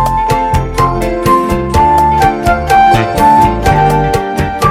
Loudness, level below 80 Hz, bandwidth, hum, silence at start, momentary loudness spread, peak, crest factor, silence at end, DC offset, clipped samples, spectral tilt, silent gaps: -10 LUFS; -22 dBFS; 16.5 kHz; none; 0 s; 6 LU; 0 dBFS; 10 dB; 0 s; under 0.1%; under 0.1%; -6 dB/octave; none